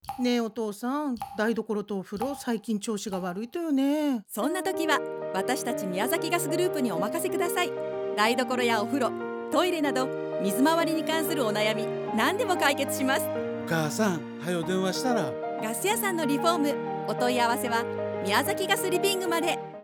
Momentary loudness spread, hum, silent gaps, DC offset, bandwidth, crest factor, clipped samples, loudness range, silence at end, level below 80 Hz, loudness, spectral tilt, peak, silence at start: 7 LU; none; none; under 0.1%; over 20 kHz; 18 dB; under 0.1%; 3 LU; 0 s; -70 dBFS; -27 LUFS; -4 dB/octave; -8 dBFS; 0.05 s